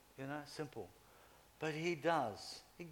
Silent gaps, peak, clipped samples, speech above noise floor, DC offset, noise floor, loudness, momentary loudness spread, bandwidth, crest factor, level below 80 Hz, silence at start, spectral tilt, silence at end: none; -22 dBFS; under 0.1%; 23 dB; under 0.1%; -65 dBFS; -42 LUFS; 15 LU; 19 kHz; 22 dB; -76 dBFS; 0.15 s; -5 dB/octave; 0 s